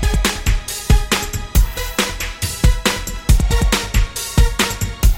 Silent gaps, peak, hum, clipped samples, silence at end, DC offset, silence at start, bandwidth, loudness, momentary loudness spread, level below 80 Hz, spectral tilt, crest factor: none; 0 dBFS; none; under 0.1%; 0 s; under 0.1%; 0 s; 17 kHz; -18 LUFS; 5 LU; -18 dBFS; -4 dB/octave; 16 dB